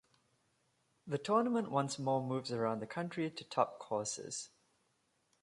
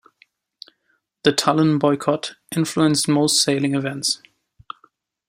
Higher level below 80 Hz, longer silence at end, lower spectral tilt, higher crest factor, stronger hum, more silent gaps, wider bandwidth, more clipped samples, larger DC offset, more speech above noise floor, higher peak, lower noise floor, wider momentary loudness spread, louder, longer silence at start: second, -80 dBFS vs -62 dBFS; second, 0.95 s vs 1.15 s; about the same, -5 dB/octave vs -4 dB/octave; about the same, 22 dB vs 20 dB; neither; neither; second, 11.5 kHz vs 16 kHz; neither; neither; second, 42 dB vs 50 dB; second, -16 dBFS vs -2 dBFS; first, -78 dBFS vs -69 dBFS; second, 9 LU vs 16 LU; second, -37 LUFS vs -19 LUFS; second, 1.05 s vs 1.25 s